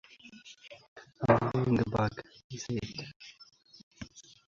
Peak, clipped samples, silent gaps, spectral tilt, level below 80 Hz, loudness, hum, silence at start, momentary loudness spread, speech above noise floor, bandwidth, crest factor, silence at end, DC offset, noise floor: -10 dBFS; under 0.1%; 0.88-0.96 s, 2.44-2.50 s, 3.16-3.20 s, 3.83-3.91 s; -6.5 dB/octave; -56 dBFS; -31 LUFS; none; 0.25 s; 24 LU; 21 dB; 7.4 kHz; 24 dB; 0.3 s; under 0.1%; -54 dBFS